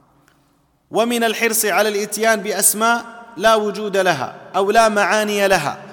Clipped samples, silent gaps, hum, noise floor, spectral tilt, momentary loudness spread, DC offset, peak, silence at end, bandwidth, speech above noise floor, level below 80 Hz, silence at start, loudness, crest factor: under 0.1%; none; none; -59 dBFS; -2.5 dB/octave; 7 LU; under 0.1%; -2 dBFS; 0 s; 19 kHz; 42 dB; -54 dBFS; 0.9 s; -17 LUFS; 16 dB